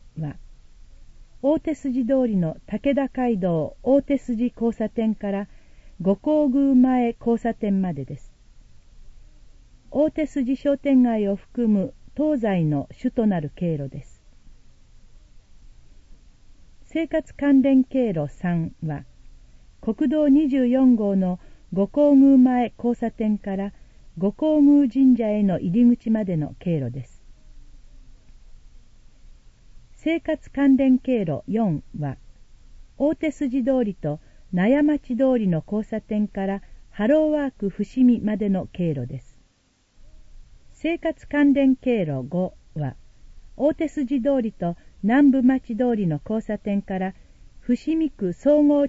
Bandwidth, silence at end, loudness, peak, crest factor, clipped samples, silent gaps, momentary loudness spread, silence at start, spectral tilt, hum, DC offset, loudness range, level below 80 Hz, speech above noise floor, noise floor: 7.8 kHz; 0 s; -22 LUFS; -8 dBFS; 14 dB; under 0.1%; none; 13 LU; 0.05 s; -9 dB/octave; none; under 0.1%; 7 LU; -46 dBFS; 43 dB; -63 dBFS